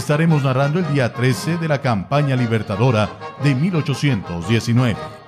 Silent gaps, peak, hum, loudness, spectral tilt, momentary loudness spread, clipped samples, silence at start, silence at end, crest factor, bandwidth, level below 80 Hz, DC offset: none; -6 dBFS; none; -19 LUFS; -6.5 dB/octave; 4 LU; under 0.1%; 0 s; 0.05 s; 12 dB; 14 kHz; -46 dBFS; under 0.1%